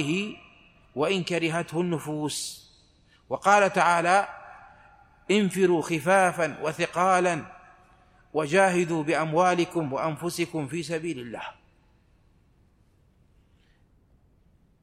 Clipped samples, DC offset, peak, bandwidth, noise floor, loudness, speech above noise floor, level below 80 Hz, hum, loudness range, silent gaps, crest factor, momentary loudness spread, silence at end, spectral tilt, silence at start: under 0.1%; under 0.1%; -6 dBFS; 15.5 kHz; -62 dBFS; -25 LUFS; 37 dB; -64 dBFS; none; 10 LU; none; 20 dB; 15 LU; 3.3 s; -5 dB/octave; 0 s